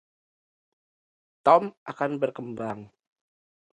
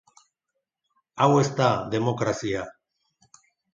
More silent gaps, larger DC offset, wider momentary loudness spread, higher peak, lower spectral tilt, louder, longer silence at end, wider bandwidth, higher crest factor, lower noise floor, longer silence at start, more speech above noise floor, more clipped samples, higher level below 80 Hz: first, 1.77-1.86 s vs none; neither; about the same, 15 LU vs 14 LU; about the same, -4 dBFS vs -6 dBFS; about the same, -7 dB/octave vs -6 dB/octave; about the same, -25 LUFS vs -24 LUFS; about the same, 0.9 s vs 1 s; first, 9.4 kHz vs 7.6 kHz; about the same, 24 dB vs 22 dB; first, under -90 dBFS vs -82 dBFS; first, 1.45 s vs 1.15 s; first, over 65 dB vs 59 dB; neither; second, -74 dBFS vs -60 dBFS